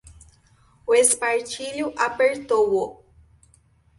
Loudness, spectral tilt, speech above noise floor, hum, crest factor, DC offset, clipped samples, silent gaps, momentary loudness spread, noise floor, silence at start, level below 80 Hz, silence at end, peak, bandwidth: -21 LUFS; -1.5 dB/octave; 37 dB; none; 20 dB; under 0.1%; under 0.1%; none; 12 LU; -58 dBFS; 0.1 s; -58 dBFS; 1.05 s; -4 dBFS; 12 kHz